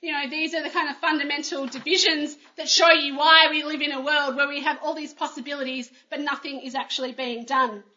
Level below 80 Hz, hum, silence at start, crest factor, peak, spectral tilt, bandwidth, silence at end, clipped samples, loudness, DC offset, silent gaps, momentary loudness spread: -88 dBFS; none; 0.05 s; 24 dB; 0 dBFS; 0 dB/octave; 7.8 kHz; 0.15 s; under 0.1%; -22 LUFS; under 0.1%; none; 15 LU